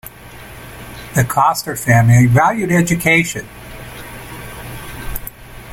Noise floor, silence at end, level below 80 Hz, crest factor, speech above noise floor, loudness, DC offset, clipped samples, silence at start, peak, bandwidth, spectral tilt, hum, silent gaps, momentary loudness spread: -36 dBFS; 0 s; -38 dBFS; 16 dB; 23 dB; -13 LUFS; under 0.1%; under 0.1%; 0.05 s; -2 dBFS; 17 kHz; -5.5 dB/octave; none; none; 23 LU